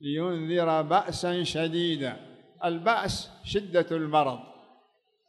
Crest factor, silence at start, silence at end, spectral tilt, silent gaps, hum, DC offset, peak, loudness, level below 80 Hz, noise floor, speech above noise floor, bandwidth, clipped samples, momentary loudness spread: 18 dB; 0 s; 0.75 s; -5 dB/octave; none; none; under 0.1%; -10 dBFS; -28 LUFS; -56 dBFS; -68 dBFS; 41 dB; 12 kHz; under 0.1%; 8 LU